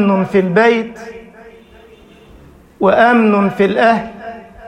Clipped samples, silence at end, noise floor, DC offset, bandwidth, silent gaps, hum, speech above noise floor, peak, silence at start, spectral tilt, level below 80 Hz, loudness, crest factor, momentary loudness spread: under 0.1%; 0 s; -42 dBFS; under 0.1%; 9.2 kHz; none; none; 30 dB; 0 dBFS; 0 s; -7.5 dB/octave; -48 dBFS; -12 LUFS; 14 dB; 21 LU